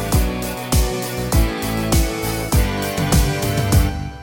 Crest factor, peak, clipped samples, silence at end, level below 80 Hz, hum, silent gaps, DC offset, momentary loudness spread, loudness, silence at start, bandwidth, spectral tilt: 16 dB; -2 dBFS; under 0.1%; 0 s; -22 dBFS; none; none; 0.1%; 5 LU; -19 LUFS; 0 s; 17 kHz; -5 dB/octave